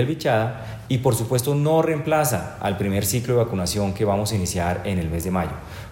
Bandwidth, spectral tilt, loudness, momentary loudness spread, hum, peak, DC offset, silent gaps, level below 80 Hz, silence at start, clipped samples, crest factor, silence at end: 16.5 kHz; -5.5 dB/octave; -22 LUFS; 6 LU; none; -6 dBFS; under 0.1%; none; -42 dBFS; 0 s; under 0.1%; 16 dB; 0 s